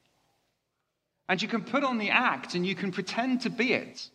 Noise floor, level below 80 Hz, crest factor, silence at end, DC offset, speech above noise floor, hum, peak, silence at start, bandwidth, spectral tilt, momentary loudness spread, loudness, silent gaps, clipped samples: -81 dBFS; -78 dBFS; 22 dB; 0.05 s; under 0.1%; 52 dB; none; -8 dBFS; 1.3 s; 10.5 kHz; -5 dB/octave; 7 LU; -28 LUFS; none; under 0.1%